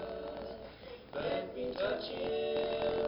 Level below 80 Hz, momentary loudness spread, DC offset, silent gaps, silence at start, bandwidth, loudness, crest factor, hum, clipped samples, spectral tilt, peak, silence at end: -60 dBFS; 13 LU; under 0.1%; none; 0 s; 5.6 kHz; -37 LUFS; 14 dB; none; under 0.1%; -8 dB/octave; -22 dBFS; 0 s